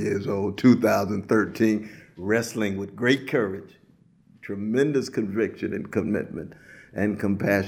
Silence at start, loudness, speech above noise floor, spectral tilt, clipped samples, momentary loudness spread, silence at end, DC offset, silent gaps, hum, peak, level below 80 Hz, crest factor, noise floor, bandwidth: 0 s; -25 LUFS; 34 dB; -6.5 dB/octave; under 0.1%; 15 LU; 0 s; under 0.1%; none; none; -6 dBFS; -62 dBFS; 20 dB; -58 dBFS; 15.5 kHz